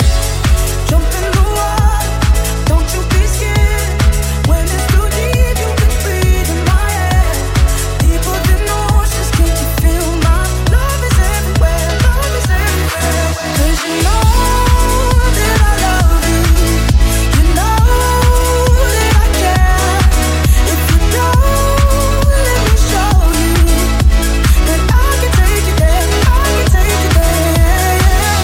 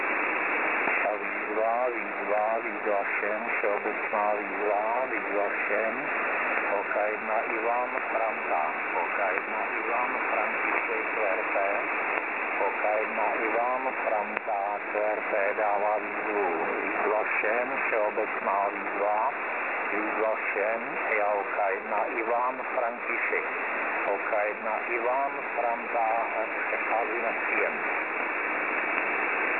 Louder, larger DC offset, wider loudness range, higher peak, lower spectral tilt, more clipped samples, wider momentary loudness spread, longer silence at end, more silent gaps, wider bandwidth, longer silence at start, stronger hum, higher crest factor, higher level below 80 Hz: first, -12 LUFS vs -27 LUFS; neither; about the same, 2 LU vs 1 LU; first, 0 dBFS vs -6 dBFS; second, -4.5 dB/octave vs -8 dB/octave; neither; about the same, 3 LU vs 3 LU; about the same, 0 s vs 0 s; neither; first, 17 kHz vs 4.4 kHz; about the same, 0 s vs 0 s; neither; second, 10 dB vs 22 dB; first, -12 dBFS vs -78 dBFS